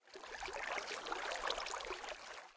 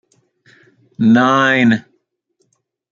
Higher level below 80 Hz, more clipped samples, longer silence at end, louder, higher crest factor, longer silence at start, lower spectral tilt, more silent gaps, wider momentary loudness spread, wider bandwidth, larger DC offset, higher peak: second, -68 dBFS vs -62 dBFS; neither; second, 0 s vs 1.1 s; second, -43 LUFS vs -13 LUFS; about the same, 20 dB vs 16 dB; second, 0.05 s vs 1 s; second, -0.5 dB/octave vs -6 dB/octave; neither; about the same, 8 LU vs 6 LU; first, 8 kHz vs 7.2 kHz; neither; second, -24 dBFS vs -2 dBFS